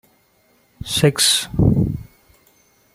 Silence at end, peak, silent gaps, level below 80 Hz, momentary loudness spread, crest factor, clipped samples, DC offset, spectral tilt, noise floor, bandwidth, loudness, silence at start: 0.9 s; 0 dBFS; none; -36 dBFS; 15 LU; 20 dB; under 0.1%; under 0.1%; -4 dB/octave; -59 dBFS; 16 kHz; -17 LUFS; 0.85 s